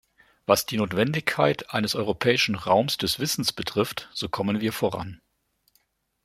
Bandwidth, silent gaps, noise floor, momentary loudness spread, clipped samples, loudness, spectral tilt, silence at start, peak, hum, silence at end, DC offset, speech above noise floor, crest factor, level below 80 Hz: 16.5 kHz; none; -70 dBFS; 8 LU; under 0.1%; -25 LUFS; -4 dB/octave; 0.5 s; -2 dBFS; none; 1.1 s; under 0.1%; 46 dB; 24 dB; -58 dBFS